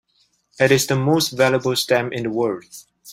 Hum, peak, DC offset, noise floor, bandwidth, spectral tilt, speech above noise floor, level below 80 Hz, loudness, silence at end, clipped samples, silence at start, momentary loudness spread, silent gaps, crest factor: none; -2 dBFS; under 0.1%; -64 dBFS; 16 kHz; -4.5 dB/octave; 45 dB; -58 dBFS; -19 LUFS; 0 s; under 0.1%; 0.6 s; 8 LU; none; 18 dB